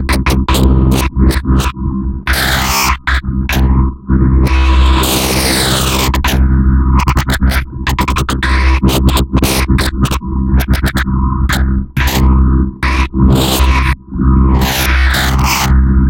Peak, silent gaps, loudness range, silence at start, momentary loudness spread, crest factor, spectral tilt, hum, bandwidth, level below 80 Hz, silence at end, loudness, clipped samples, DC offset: 0 dBFS; none; 2 LU; 0 s; 5 LU; 10 dB; -5 dB/octave; none; 17 kHz; -14 dBFS; 0 s; -12 LUFS; under 0.1%; under 0.1%